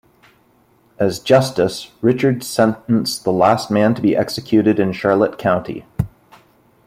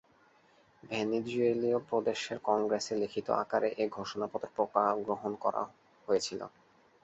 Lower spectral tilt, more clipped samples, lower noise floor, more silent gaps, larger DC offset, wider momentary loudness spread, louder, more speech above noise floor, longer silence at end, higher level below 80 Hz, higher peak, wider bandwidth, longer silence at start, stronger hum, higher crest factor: first, -6 dB/octave vs -4.5 dB/octave; neither; second, -55 dBFS vs -65 dBFS; neither; neither; about the same, 7 LU vs 9 LU; first, -17 LUFS vs -33 LUFS; first, 39 dB vs 33 dB; first, 0.8 s vs 0.55 s; first, -48 dBFS vs -74 dBFS; first, -2 dBFS vs -12 dBFS; first, 16 kHz vs 8.2 kHz; first, 1 s vs 0.85 s; neither; about the same, 16 dB vs 20 dB